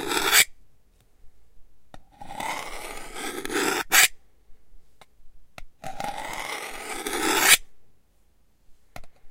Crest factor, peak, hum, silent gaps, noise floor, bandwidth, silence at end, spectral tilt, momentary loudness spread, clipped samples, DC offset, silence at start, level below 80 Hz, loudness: 26 dB; -2 dBFS; none; none; -64 dBFS; 16.5 kHz; 0 s; 0 dB/octave; 19 LU; under 0.1%; under 0.1%; 0 s; -50 dBFS; -22 LUFS